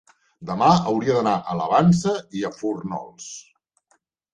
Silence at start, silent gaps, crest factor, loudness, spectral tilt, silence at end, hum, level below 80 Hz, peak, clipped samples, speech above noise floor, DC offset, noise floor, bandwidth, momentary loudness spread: 0.4 s; none; 20 dB; -21 LUFS; -6.5 dB/octave; 0.95 s; none; -56 dBFS; -4 dBFS; under 0.1%; 46 dB; under 0.1%; -67 dBFS; 9.4 kHz; 19 LU